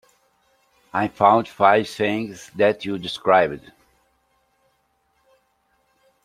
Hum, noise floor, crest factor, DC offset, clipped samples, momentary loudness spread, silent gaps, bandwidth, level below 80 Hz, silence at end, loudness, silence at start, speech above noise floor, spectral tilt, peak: none; -67 dBFS; 22 dB; under 0.1%; under 0.1%; 11 LU; none; 15 kHz; -62 dBFS; 2.65 s; -20 LUFS; 0.95 s; 47 dB; -5.5 dB/octave; -2 dBFS